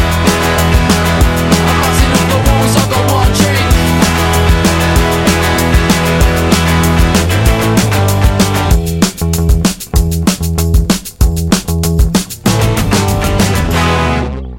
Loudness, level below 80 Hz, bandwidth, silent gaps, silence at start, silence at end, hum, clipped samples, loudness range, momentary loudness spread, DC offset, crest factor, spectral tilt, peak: -11 LUFS; -16 dBFS; 17.5 kHz; none; 0 s; 0 s; none; under 0.1%; 3 LU; 4 LU; under 0.1%; 10 dB; -5 dB/octave; 0 dBFS